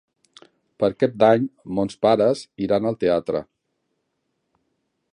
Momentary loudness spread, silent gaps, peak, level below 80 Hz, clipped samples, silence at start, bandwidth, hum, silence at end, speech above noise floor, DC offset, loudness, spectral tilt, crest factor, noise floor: 9 LU; none; -4 dBFS; -58 dBFS; under 0.1%; 0.8 s; 11 kHz; none; 1.7 s; 55 dB; under 0.1%; -21 LUFS; -7 dB/octave; 20 dB; -75 dBFS